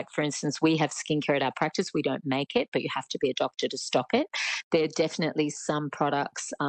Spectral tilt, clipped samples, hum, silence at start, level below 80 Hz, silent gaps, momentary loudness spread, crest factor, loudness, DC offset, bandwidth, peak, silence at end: -4.5 dB/octave; under 0.1%; none; 0 s; -72 dBFS; 2.68-2.72 s, 4.63-4.71 s; 5 LU; 16 dB; -28 LUFS; under 0.1%; 9.4 kHz; -12 dBFS; 0 s